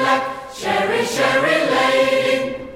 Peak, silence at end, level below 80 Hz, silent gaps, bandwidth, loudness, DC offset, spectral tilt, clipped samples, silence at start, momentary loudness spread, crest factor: -2 dBFS; 0 s; -54 dBFS; none; 16 kHz; -17 LUFS; under 0.1%; -3.5 dB/octave; under 0.1%; 0 s; 6 LU; 14 dB